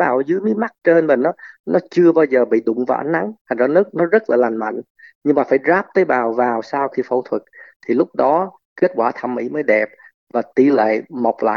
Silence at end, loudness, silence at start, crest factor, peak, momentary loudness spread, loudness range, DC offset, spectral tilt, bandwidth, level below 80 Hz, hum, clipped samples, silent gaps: 0 s; -17 LUFS; 0 s; 16 dB; -2 dBFS; 10 LU; 3 LU; under 0.1%; -8 dB/octave; 6.6 kHz; -70 dBFS; none; under 0.1%; 1.60-1.64 s, 3.41-3.45 s, 4.90-4.95 s, 5.15-5.21 s, 7.76-7.80 s, 8.65-8.76 s, 10.14-10.27 s